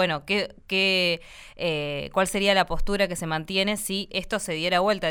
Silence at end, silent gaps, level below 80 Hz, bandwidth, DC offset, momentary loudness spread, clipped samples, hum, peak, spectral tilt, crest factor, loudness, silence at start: 0 s; none; -40 dBFS; 19 kHz; under 0.1%; 7 LU; under 0.1%; none; -6 dBFS; -3.5 dB/octave; 20 dB; -25 LUFS; 0 s